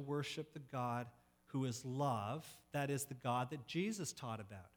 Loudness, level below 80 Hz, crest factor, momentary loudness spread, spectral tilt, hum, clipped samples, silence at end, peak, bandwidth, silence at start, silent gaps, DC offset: -43 LUFS; -78 dBFS; 18 dB; 8 LU; -5 dB/octave; none; under 0.1%; 0.1 s; -24 dBFS; over 20 kHz; 0 s; none; under 0.1%